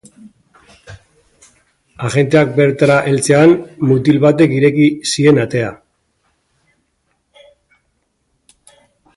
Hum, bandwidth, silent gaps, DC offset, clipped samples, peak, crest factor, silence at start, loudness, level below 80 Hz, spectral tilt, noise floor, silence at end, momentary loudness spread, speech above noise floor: none; 11.5 kHz; none; under 0.1%; under 0.1%; 0 dBFS; 16 dB; 0.9 s; -12 LUFS; -52 dBFS; -6 dB/octave; -65 dBFS; 3.45 s; 9 LU; 54 dB